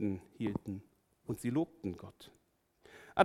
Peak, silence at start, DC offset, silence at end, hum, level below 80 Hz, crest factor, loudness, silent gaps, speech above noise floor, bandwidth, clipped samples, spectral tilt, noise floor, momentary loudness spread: -12 dBFS; 0 s; under 0.1%; 0 s; none; -68 dBFS; 26 dB; -40 LUFS; none; 28 dB; 15 kHz; under 0.1%; -6.5 dB/octave; -67 dBFS; 22 LU